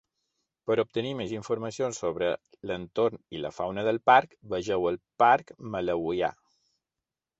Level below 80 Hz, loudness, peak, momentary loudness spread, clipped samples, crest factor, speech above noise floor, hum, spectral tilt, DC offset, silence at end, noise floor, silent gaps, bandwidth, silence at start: -62 dBFS; -28 LUFS; -6 dBFS; 13 LU; under 0.1%; 22 dB; 62 dB; none; -5 dB/octave; under 0.1%; 1.05 s; -90 dBFS; none; 8.2 kHz; 0.65 s